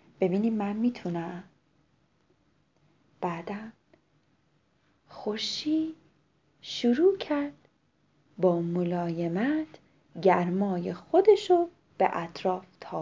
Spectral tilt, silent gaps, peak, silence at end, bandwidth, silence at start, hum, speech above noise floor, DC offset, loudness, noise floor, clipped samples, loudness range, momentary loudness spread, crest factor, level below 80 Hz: -6.5 dB/octave; none; -8 dBFS; 0 s; 7.6 kHz; 0.2 s; none; 42 dB; under 0.1%; -28 LUFS; -69 dBFS; under 0.1%; 15 LU; 15 LU; 20 dB; -72 dBFS